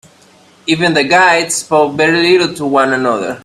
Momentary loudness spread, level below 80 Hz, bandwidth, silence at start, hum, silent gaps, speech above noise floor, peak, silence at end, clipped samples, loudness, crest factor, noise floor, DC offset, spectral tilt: 6 LU; -54 dBFS; 13 kHz; 0.65 s; none; none; 34 dB; 0 dBFS; 0.05 s; under 0.1%; -11 LUFS; 12 dB; -45 dBFS; under 0.1%; -3.5 dB/octave